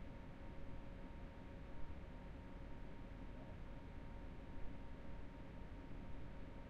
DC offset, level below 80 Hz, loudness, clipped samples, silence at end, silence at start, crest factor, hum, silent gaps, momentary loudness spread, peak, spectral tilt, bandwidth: under 0.1%; -56 dBFS; -56 LUFS; under 0.1%; 0 s; 0 s; 16 dB; none; none; 1 LU; -34 dBFS; -7.5 dB/octave; 7.4 kHz